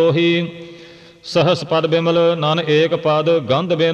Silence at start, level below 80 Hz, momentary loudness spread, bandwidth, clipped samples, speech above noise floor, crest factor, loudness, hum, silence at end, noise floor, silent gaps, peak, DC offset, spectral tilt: 0 s; -58 dBFS; 11 LU; 8.8 kHz; under 0.1%; 25 dB; 12 dB; -16 LUFS; none; 0 s; -41 dBFS; none; -4 dBFS; under 0.1%; -6.5 dB/octave